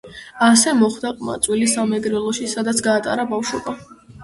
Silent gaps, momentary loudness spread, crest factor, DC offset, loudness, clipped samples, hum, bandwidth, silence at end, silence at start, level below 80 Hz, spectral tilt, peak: none; 13 LU; 18 dB; under 0.1%; -18 LUFS; under 0.1%; none; 11.5 kHz; 0 s; 0.05 s; -54 dBFS; -3 dB/octave; 0 dBFS